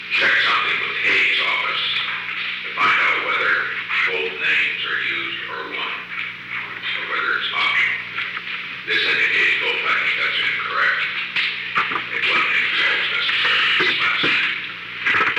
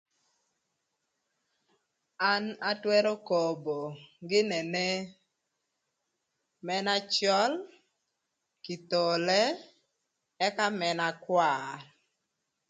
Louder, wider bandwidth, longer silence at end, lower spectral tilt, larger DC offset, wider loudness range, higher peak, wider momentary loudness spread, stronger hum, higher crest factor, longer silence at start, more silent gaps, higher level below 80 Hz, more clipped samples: first, -18 LUFS vs -29 LUFS; first, 16.5 kHz vs 9.6 kHz; second, 0 s vs 0.85 s; second, -2 dB/octave vs -3.5 dB/octave; neither; about the same, 5 LU vs 3 LU; first, -6 dBFS vs -12 dBFS; second, 10 LU vs 15 LU; first, 60 Hz at -55 dBFS vs none; second, 14 dB vs 20 dB; second, 0 s vs 2.2 s; neither; first, -64 dBFS vs -82 dBFS; neither